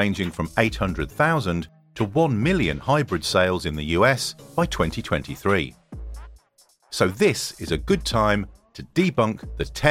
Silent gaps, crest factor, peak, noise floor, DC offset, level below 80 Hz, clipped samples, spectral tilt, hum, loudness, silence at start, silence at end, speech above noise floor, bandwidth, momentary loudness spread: none; 22 dB; -2 dBFS; -60 dBFS; under 0.1%; -38 dBFS; under 0.1%; -5 dB/octave; none; -23 LUFS; 0 s; 0 s; 37 dB; 16.5 kHz; 13 LU